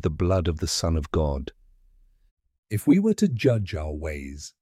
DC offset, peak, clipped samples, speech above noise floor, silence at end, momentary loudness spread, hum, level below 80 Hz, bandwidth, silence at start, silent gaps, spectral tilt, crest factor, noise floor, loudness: under 0.1%; -8 dBFS; under 0.1%; 34 dB; 0.15 s; 13 LU; none; -36 dBFS; 15.5 kHz; 0.05 s; 2.31-2.37 s, 2.58-2.63 s; -6 dB/octave; 18 dB; -58 dBFS; -25 LUFS